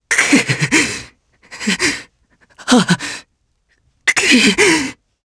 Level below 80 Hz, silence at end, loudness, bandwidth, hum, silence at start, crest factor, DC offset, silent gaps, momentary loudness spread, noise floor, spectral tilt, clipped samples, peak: -50 dBFS; 0.35 s; -13 LUFS; 11 kHz; none; 0.1 s; 16 dB; under 0.1%; none; 16 LU; -62 dBFS; -3 dB/octave; under 0.1%; 0 dBFS